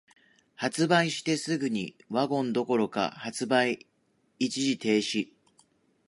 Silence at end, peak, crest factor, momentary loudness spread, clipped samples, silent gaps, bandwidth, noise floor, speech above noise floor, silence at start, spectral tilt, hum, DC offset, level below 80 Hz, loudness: 0.85 s; -8 dBFS; 20 dB; 9 LU; under 0.1%; none; 11.5 kHz; -71 dBFS; 43 dB; 0.6 s; -4.5 dB/octave; none; under 0.1%; -74 dBFS; -28 LUFS